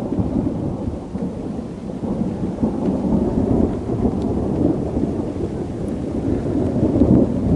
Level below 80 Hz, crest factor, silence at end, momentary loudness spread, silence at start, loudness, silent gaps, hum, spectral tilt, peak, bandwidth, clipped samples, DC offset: -34 dBFS; 18 dB; 0 s; 10 LU; 0 s; -21 LUFS; none; none; -10 dB/octave; -2 dBFS; 11 kHz; under 0.1%; under 0.1%